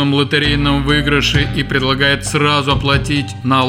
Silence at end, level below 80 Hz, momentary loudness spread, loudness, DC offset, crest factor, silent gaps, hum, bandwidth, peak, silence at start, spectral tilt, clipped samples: 0 s; -28 dBFS; 3 LU; -14 LUFS; under 0.1%; 12 dB; none; none; 15.5 kHz; -2 dBFS; 0 s; -5 dB/octave; under 0.1%